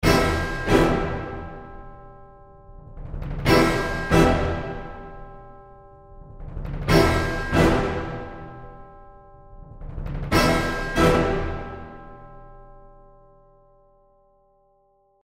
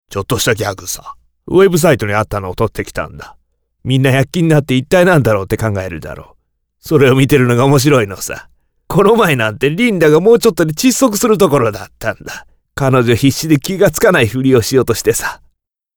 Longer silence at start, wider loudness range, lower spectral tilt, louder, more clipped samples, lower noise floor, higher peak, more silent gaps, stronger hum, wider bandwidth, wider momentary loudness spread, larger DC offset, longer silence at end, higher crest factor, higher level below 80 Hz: about the same, 0 s vs 0.1 s; about the same, 3 LU vs 3 LU; about the same, -5.5 dB/octave vs -5.5 dB/octave; second, -22 LUFS vs -12 LUFS; neither; about the same, -63 dBFS vs -60 dBFS; second, -4 dBFS vs 0 dBFS; neither; neither; second, 16 kHz vs over 20 kHz; first, 24 LU vs 14 LU; neither; first, 2.35 s vs 0.6 s; first, 22 dB vs 12 dB; about the same, -34 dBFS vs -38 dBFS